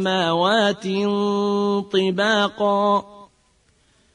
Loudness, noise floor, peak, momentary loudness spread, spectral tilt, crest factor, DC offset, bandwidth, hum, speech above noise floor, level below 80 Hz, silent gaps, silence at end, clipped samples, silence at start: -20 LUFS; -61 dBFS; -6 dBFS; 4 LU; -5 dB/octave; 16 dB; under 0.1%; 10.5 kHz; none; 41 dB; -62 dBFS; none; 0.9 s; under 0.1%; 0 s